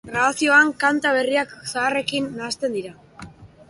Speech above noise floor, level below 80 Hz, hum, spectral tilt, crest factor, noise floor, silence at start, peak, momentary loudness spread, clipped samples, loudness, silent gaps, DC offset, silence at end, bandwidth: 22 dB; -58 dBFS; none; -3 dB/octave; 18 dB; -42 dBFS; 0.05 s; -4 dBFS; 12 LU; under 0.1%; -20 LUFS; none; under 0.1%; 0.25 s; 11.5 kHz